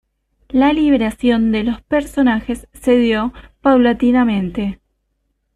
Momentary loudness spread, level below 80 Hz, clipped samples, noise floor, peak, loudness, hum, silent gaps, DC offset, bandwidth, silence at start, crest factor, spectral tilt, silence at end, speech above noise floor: 9 LU; -40 dBFS; under 0.1%; -68 dBFS; -2 dBFS; -16 LUFS; none; none; under 0.1%; 12.5 kHz; 0.55 s; 14 dB; -6.5 dB/octave; 0.8 s; 53 dB